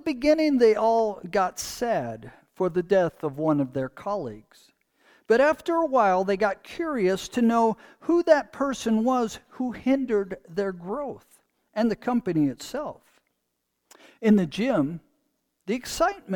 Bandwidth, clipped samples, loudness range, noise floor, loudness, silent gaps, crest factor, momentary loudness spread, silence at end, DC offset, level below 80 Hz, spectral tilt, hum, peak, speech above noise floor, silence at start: 19 kHz; under 0.1%; 5 LU; -78 dBFS; -25 LUFS; none; 18 dB; 12 LU; 0 s; under 0.1%; -56 dBFS; -5.5 dB/octave; none; -6 dBFS; 54 dB; 0.05 s